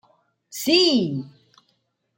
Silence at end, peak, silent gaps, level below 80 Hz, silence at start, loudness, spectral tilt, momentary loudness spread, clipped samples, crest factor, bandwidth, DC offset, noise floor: 0.9 s; -4 dBFS; none; -70 dBFS; 0.55 s; -19 LUFS; -4 dB/octave; 17 LU; under 0.1%; 20 dB; 17 kHz; under 0.1%; -70 dBFS